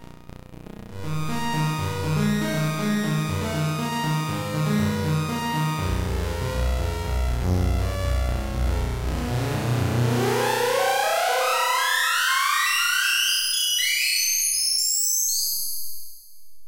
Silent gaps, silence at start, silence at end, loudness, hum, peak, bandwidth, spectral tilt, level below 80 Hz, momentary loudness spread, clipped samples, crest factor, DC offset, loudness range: none; 0 s; 0 s; -23 LUFS; none; -8 dBFS; 16 kHz; -3.5 dB/octave; -32 dBFS; 8 LU; under 0.1%; 14 dB; under 0.1%; 6 LU